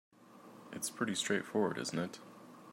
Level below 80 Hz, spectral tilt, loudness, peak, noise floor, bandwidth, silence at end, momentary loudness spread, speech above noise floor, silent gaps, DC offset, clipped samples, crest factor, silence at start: -82 dBFS; -3.5 dB/octave; -37 LUFS; -20 dBFS; -57 dBFS; 16 kHz; 0 s; 21 LU; 21 dB; none; under 0.1%; under 0.1%; 18 dB; 0.25 s